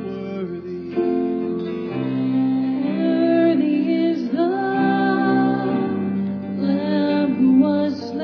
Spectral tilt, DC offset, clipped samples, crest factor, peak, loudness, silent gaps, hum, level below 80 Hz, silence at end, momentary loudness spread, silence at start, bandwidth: -9 dB/octave; under 0.1%; under 0.1%; 14 dB; -6 dBFS; -20 LUFS; none; none; -66 dBFS; 0 s; 9 LU; 0 s; 5.4 kHz